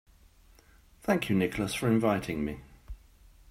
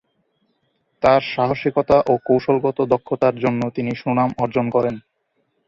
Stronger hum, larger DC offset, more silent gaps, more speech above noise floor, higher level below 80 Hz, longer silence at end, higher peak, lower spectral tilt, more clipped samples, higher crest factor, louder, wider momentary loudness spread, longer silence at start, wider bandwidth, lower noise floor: neither; neither; neither; second, 30 dB vs 51 dB; about the same, -52 dBFS vs -50 dBFS; second, 0.55 s vs 0.7 s; second, -12 dBFS vs -2 dBFS; second, -6 dB/octave vs -8 dB/octave; neither; about the same, 20 dB vs 18 dB; second, -29 LUFS vs -19 LUFS; first, 24 LU vs 6 LU; about the same, 1.05 s vs 1 s; first, 16 kHz vs 7.4 kHz; second, -59 dBFS vs -69 dBFS